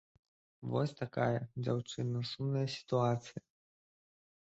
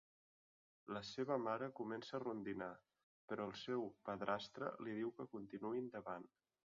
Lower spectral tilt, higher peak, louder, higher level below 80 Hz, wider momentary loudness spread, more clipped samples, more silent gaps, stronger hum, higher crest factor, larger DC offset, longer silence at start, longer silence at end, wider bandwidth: first, -6 dB/octave vs -4 dB/octave; first, -18 dBFS vs -26 dBFS; first, -36 LUFS vs -47 LUFS; first, -72 dBFS vs -82 dBFS; about the same, 7 LU vs 9 LU; neither; second, none vs 3.03-3.28 s; neither; about the same, 20 dB vs 22 dB; neither; second, 0.6 s vs 0.85 s; first, 1.2 s vs 0.4 s; about the same, 8 kHz vs 7.4 kHz